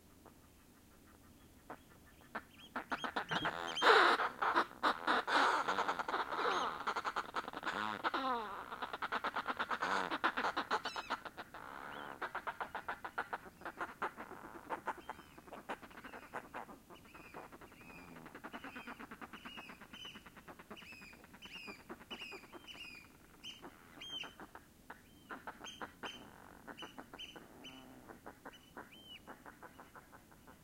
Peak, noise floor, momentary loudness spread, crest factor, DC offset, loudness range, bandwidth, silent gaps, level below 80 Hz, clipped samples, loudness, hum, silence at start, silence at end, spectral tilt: -14 dBFS; -64 dBFS; 21 LU; 28 dB; under 0.1%; 18 LU; 16.5 kHz; none; -70 dBFS; under 0.1%; -39 LUFS; none; 0.05 s; 0.05 s; -3 dB/octave